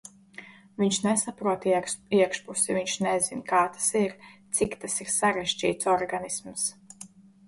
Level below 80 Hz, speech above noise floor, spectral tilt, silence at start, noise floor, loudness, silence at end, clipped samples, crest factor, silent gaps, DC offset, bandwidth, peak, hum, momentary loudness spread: -62 dBFS; 23 dB; -3 dB/octave; 0.05 s; -49 dBFS; -26 LUFS; 0.4 s; under 0.1%; 18 dB; none; under 0.1%; 11.5 kHz; -10 dBFS; none; 21 LU